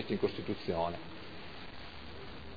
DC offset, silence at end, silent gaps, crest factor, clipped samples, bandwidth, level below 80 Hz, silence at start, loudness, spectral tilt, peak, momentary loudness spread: 0.4%; 0 s; none; 20 dB; under 0.1%; 5 kHz; -58 dBFS; 0 s; -40 LUFS; -4.5 dB/octave; -18 dBFS; 13 LU